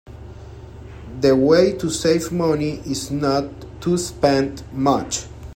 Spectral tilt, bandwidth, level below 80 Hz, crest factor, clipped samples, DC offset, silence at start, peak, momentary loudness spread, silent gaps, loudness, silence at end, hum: -5 dB/octave; 16.5 kHz; -42 dBFS; 18 dB; under 0.1%; under 0.1%; 0.05 s; -2 dBFS; 23 LU; none; -20 LUFS; 0 s; none